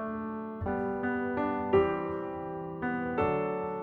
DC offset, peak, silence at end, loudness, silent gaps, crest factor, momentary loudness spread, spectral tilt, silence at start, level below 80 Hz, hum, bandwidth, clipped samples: under 0.1%; -14 dBFS; 0 s; -32 LUFS; none; 18 dB; 10 LU; -9.5 dB/octave; 0 s; -54 dBFS; none; 4.3 kHz; under 0.1%